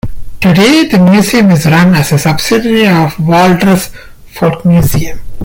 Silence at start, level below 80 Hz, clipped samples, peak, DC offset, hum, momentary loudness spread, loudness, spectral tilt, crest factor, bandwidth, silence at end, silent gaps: 0.05 s; -28 dBFS; under 0.1%; 0 dBFS; under 0.1%; none; 7 LU; -8 LUFS; -6 dB/octave; 8 dB; 17 kHz; 0 s; none